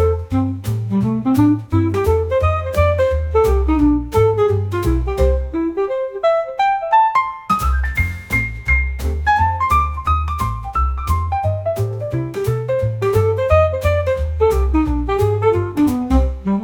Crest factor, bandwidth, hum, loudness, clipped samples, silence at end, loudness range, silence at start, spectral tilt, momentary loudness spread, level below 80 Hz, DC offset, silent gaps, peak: 14 dB; 19 kHz; none; -17 LUFS; under 0.1%; 0 s; 2 LU; 0 s; -7.5 dB/octave; 6 LU; -24 dBFS; under 0.1%; none; -2 dBFS